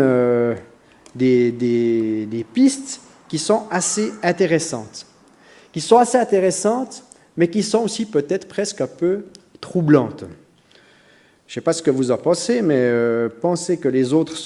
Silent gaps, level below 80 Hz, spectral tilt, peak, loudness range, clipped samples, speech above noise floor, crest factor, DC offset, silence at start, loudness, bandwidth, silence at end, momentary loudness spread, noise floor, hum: none; -64 dBFS; -5 dB/octave; 0 dBFS; 3 LU; under 0.1%; 35 dB; 20 dB; under 0.1%; 0 s; -19 LUFS; 11.5 kHz; 0 s; 15 LU; -53 dBFS; none